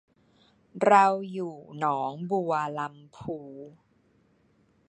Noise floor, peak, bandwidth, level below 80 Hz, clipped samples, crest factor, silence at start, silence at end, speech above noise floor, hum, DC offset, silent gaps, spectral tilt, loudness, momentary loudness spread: -66 dBFS; -6 dBFS; 9.2 kHz; -70 dBFS; under 0.1%; 24 dB; 0.75 s; 1.2 s; 39 dB; none; under 0.1%; none; -6 dB/octave; -27 LUFS; 22 LU